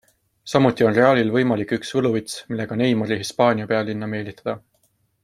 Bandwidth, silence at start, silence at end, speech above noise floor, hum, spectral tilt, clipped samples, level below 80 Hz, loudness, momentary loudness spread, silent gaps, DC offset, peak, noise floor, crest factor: 14.5 kHz; 0.45 s; 0.65 s; 45 dB; none; -6 dB/octave; under 0.1%; -60 dBFS; -21 LUFS; 13 LU; none; under 0.1%; -2 dBFS; -65 dBFS; 20 dB